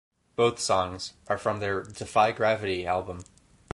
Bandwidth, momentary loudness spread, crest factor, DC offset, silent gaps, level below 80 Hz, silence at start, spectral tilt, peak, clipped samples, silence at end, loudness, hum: 11.5 kHz; 14 LU; 20 dB; under 0.1%; none; -54 dBFS; 0.4 s; -4 dB/octave; -8 dBFS; under 0.1%; 0.5 s; -27 LUFS; none